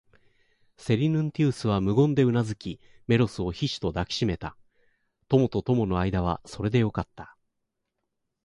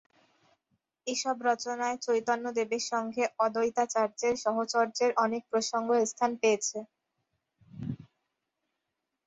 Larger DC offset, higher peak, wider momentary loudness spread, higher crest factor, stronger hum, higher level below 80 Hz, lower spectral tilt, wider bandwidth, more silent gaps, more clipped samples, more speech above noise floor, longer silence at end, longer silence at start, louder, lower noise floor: neither; first, -8 dBFS vs -14 dBFS; first, 14 LU vs 10 LU; about the same, 18 dB vs 18 dB; neither; first, -46 dBFS vs -72 dBFS; first, -7 dB/octave vs -3 dB/octave; first, 11 kHz vs 8.2 kHz; neither; neither; about the same, 56 dB vs 56 dB; about the same, 1.2 s vs 1.25 s; second, 0.8 s vs 1.05 s; first, -26 LUFS vs -30 LUFS; second, -81 dBFS vs -85 dBFS